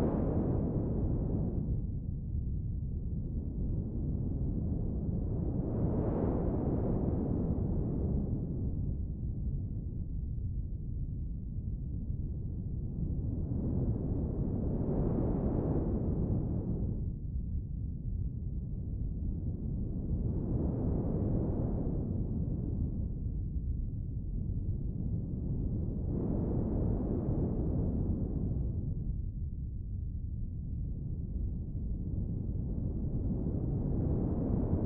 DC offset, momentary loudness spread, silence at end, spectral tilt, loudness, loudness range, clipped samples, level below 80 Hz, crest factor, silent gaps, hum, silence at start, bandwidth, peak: under 0.1%; 7 LU; 0 s; -15 dB/octave; -36 LUFS; 5 LU; under 0.1%; -38 dBFS; 16 dB; none; none; 0 s; 2.2 kHz; -18 dBFS